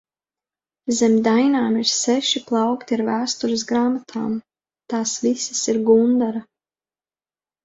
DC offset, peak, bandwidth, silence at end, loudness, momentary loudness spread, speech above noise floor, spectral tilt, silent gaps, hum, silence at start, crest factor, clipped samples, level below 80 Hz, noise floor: under 0.1%; -4 dBFS; 8 kHz; 1.2 s; -20 LUFS; 10 LU; over 71 dB; -3.5 dB/octave; none; none; 0.85 s; 18 dB; under 0.1%; -64 dBFS; under -90 dBFS